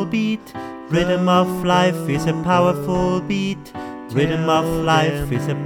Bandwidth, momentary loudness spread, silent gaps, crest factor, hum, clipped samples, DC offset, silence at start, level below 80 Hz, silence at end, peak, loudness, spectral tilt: 18.5 kHz; 10 LU; none; 14 dB; none; under 0.1%; under 0.1%; 0 s; -40 dBFS; 0 s; -4 dBFS; -19 LUFS; -6 dB/octave